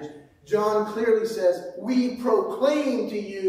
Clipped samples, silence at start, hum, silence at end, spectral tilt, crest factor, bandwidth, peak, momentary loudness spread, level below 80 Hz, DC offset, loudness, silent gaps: under 0.1%; 0 s; none; 0 s; -5.5 dB/octave; 16 dB; 15.5 kHz; -8 dBFS; 6 LU; -68 dBFS; under 0.1%; -24 LUFS; none